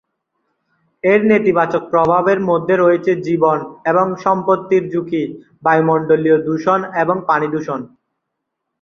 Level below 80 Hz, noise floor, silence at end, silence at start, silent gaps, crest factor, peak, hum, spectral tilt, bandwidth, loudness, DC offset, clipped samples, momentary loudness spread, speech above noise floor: -58 dBFS; -76 dBFS; 0.95 s; 1.05 s; none; 14 dB; -2 dBFS; none; -8 dB/octave; 7 kHz; -15 LUFS; under 0.1%; under 0.1%; 7 LU; 61 dB